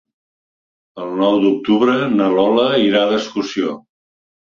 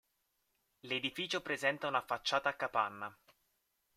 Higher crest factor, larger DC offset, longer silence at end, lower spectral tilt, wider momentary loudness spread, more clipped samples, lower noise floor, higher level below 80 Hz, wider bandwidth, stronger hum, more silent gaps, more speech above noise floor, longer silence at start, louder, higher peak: second, 16 dB vs 22 dB; neither; about the same, 0.8 s vs 0.85 s; first, -6 dB/octave vs -3 dB/octave; first, 10 LU vs 6 LU; neither; first, under -90 dBFS vs -81 dBFS; first, -60 dBFS vs -78 dBFS; second, 7.2 kHz vs 16 kHz; neither; neither; first, over 75 dB vs 44 dB; about the same, 0.95 s vs 0.85 s; first, -16 LUFS vs -36 LUFS; first, -2 dBFS vs -16 dBFS